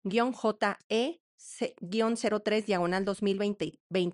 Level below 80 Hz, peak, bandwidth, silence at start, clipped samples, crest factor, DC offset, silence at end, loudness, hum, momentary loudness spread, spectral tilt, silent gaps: -68 dBFS; -14 dBFS; 11 kHz; 0.05 s; under 0.1%; 16 dB; under 0.1%; 0 s; -30 LUFS; none; 8 LU; -5 dB/octave; 0.84-0.90 s, 1.20-1.38 s, 3.80-3.90 s